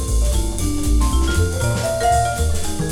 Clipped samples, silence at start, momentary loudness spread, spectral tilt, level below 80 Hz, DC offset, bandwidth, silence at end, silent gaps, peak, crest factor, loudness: under 0.1%; 0 s; 5 LU; -5 dB/octave; -20 dBFS; under 0.1%; 16.5 kHz; 0 s; none; -6 dBFS; 12 dB; -19 LUFS